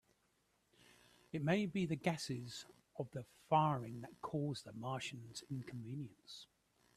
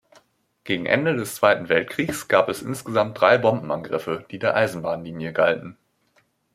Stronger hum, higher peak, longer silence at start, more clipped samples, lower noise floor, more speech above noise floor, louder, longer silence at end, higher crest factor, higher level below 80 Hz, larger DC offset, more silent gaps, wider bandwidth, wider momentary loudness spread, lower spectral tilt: neither; second, -20 dBFS vs -2 dBFS; first, 1.35 s vs 0.65 s; neither; first, -79 dBFS vs -65 dBFS; second, 38 dB vs 43 dB; second, -42 LUFS vs -22 LUFS; second, 0.55 s vs 0.8 s; about the same, 22 dB vs 22 dB; second, -76 dBFS vs -62 dBFS; neither; neither; second, 14 kHz vs 15.5 kHz; first, 15 LU vs 11 LU; about the same, -6 dB/octave vs -5 dB/octave